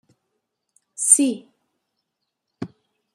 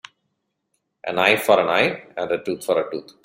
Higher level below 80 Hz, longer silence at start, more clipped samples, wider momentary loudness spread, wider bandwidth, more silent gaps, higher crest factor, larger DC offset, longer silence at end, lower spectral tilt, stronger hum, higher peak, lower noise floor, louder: second, -78 dBFS vs -64 dBFS; about the same, 1 s vs 1.05 s; neither; first, 23 LU vs 13 LU; about the same, 15 kHz vs 16 kHz; neither; about the same, 26 dB vs 22 dB; neither; first, 0.5 s vs 0.25 s; second, -2.5 dB/octave vs -4 dB/octave; neither; about the same, 0 dBFS vs -2 dBFS; first, -79 dBFS vs -75 dBFS; first, -16 LUFS vs -20 LUFS